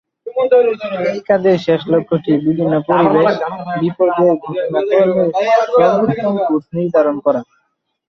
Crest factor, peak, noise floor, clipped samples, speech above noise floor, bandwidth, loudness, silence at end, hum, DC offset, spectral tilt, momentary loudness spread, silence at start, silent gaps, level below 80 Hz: 14 dB; -2 dBFS; -67 dBFS; under 0.1%; 53 dB; 6.4 kHz; -15 LUFS; 0.65 s; none; under 0.1%; -8 dB/octave; 7 LU; 0.25 s; none; -58 dBFS